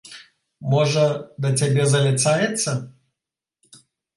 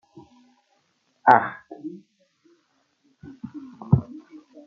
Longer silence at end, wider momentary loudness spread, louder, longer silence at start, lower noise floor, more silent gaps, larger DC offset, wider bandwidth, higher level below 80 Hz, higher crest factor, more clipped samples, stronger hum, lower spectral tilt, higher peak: first, 1.25 s vs 0.45 s; second, 10 LU vs 25 LU; about the same, -20 LUFS vs -21 LUFS; second, 0.05 s vs 1.25 s; first, -87 dBFS vs -69 dBFS; neither; neither; first, 11.5 kHz vs 6.6 kHz; second, -64 dBFS vs -58 dBFS; second, 16 dB vs 26 dB; neither; neither; second, -4.5 dB/octave vs -9 dB/octave; second, -6 dBFS vs 0 dBFS